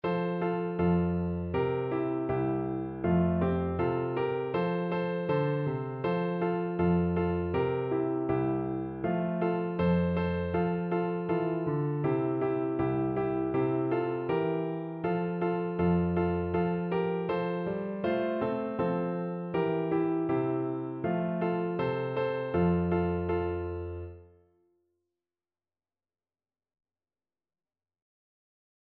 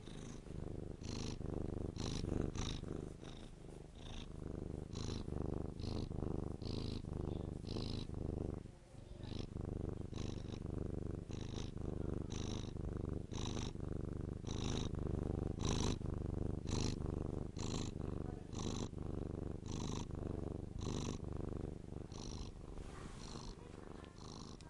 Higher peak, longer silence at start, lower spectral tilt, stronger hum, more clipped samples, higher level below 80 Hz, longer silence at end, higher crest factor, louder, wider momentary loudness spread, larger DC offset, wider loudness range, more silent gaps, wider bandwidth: first, -16 dBFS vs -22 dBFS; about the same, 0.05 s vs 0 s; first, -11.5 dB/octave vs -6 dB/octave; neither; neither; about the same, -54 dBFS vs -50 dBFS; first, 4.65 s vs 0 s; about the same, 16 dB vs 20 dB; first, -30 LUFS vs -45 LUFS; second, 5 LU vs 10 LU; neither; second, 1 LU vs 5 LU; neither; second, 4.5 kHz vs 11.5 kHz